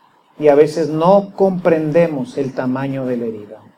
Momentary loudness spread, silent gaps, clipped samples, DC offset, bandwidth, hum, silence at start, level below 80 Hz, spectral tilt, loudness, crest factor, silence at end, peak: 10 LU; none; under 0.1%; under 0.1%; 11 kHz; none; 0.4 s; -60 dBFS; -8 dB/octave; -16 LUFS; 16 dB; 0.2 s; 0 dBFS